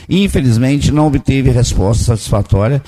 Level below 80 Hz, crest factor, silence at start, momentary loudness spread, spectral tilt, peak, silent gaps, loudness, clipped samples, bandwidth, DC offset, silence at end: -22 dBFS; 10 dB; 0 s; 2 LU; -6.5 dB/octave; -2 dBFS; none; -13 LUFS; under 0.1%; 13.5 kHz; 0.4%; 0.05 s